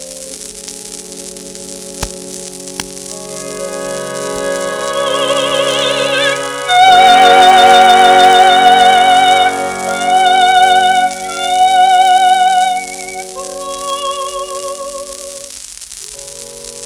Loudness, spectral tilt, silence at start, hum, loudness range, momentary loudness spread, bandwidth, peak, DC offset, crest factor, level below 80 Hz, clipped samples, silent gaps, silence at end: -9 LUFS; -1.5 dB/octave; 0 s; none; 16 LU; 21 LU; 16.5 kHz; 0 dBFS; under 0.1%; 12 dB; -46 dBFS; 0.2%; none; 0 s